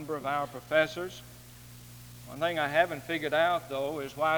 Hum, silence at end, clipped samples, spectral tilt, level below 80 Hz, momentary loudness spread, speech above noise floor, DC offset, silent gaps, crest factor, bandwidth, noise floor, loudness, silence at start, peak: 60 Hz at -50 dBFS; 0 s; under 0.1%; -4.5 dB/octave; -62 dBFS; 21 LU; 20 dB; under 0.1%; none; 20 dB; over 20 kHz; -50 dBFS; -30 LUFS; 0 s; -10 dBFS